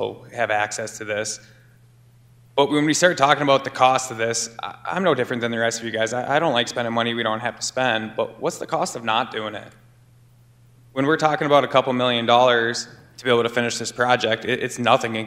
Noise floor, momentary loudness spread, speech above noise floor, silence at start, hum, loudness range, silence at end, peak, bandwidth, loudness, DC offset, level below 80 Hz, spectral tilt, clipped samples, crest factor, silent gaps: -52 dBFS; 11 LU; 31 dB; 0 s; none; 6 LU; 0 s; -2 dBFS; 16 kHz; -21 LUFS; under 0.1%; -64 dBFS; -3.5 dB/octave; under 0.1%; 20 dB; none